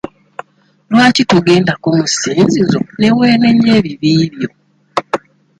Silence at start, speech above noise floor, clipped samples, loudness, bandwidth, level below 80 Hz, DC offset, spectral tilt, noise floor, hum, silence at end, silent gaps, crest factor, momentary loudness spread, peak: 0.9 s; 23 dB; under 0.1%; -12 LUFS; 10.5 kHz; -48 dBFS; under 0.1%; -5 dB/octave; -33 dBFS; none; 0.4 s; none; 12 dB; 14 LU; 0 dBFS